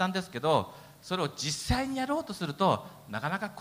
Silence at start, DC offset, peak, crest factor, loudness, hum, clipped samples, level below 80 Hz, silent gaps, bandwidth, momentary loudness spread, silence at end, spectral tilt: 0 s; under 0.1%; -12 dBFS; 20 dB; -31 LUFS; none; under 0.1%; -48 dBFS; none; 16 kHz; 8 LU; 0 s; -4.5 dB/octave